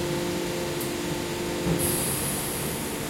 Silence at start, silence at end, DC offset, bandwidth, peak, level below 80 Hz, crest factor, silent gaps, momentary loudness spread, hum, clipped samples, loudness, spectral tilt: 0 s; 0 s; under 0.1%; 16.5 kHz; -12 dBFS; -46 dBFS; 16 dB; none; 5 LU; none; under 0.1%; -27 LUFS; -4 dB/octave